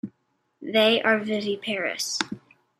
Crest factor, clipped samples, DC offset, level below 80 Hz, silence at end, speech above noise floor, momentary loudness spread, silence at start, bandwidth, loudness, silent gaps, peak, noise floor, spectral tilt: 24 dB; under 0.1%; under 0.1%; -74 dBFS; 0.4 s; 49 dB; 20 LU; 0.05 s; 15.5 kHz; -24 LUFS; none; -2 dBFS; -72 dBFS; -3 dB/octave